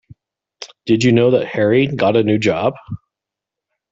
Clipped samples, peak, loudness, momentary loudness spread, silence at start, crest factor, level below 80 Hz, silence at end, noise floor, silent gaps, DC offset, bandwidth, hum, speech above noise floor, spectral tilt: under 0.1%; -2 dBFS; -15 LUFS; 20 LU; 0.6 s; 16 dB; -54 dBFS; 0.95 s; -84 dBFS; none; under 0.1%; 8 kHz; none; 70 dB; -6.5 dB/octave